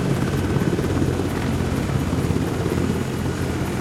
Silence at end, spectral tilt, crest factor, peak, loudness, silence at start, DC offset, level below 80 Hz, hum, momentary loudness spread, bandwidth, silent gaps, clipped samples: 0 s; -6.5 dB/octave; 14 dB; -6 dBFS; -23 LUFS; 0 s; under 0.1%; -36 dBFS; none; 3 LU; 16 kHz; none; under 0.1%